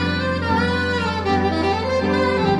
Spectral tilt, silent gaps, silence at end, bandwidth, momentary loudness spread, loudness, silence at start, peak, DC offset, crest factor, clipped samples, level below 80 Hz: -6.5 dB/octave; none; 0 s; 11.5 kHz; 2 LU; -20 LUFS; 0 s; -6 dBFS; under 0.1%; 14 dB; under 0.1%; -40 dBFS